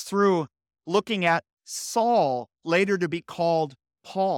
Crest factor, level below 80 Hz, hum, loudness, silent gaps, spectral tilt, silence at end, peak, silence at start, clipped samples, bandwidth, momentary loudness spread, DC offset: 16 dB; -72 dBFS; none; -25 LUFS; 1.53-1.57 s; -4.5 dB/octave; 0 s; -10 dBFS; 0 s; under 0.1%; 17 kHz; 12 LU; under 0.1%